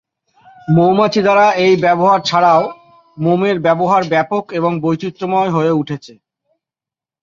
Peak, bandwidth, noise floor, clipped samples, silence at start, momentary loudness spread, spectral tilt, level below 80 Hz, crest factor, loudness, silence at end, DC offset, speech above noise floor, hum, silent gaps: 0 dBFS; 7.4 kHz; -89 dBFS; under 0.1%; 0.7 s; 9 LU; -6.5 dB/octave; -56 dBFS; 14 dB; -14 LUFS; 1.15 s; under 0.1%; 76 dB; none; none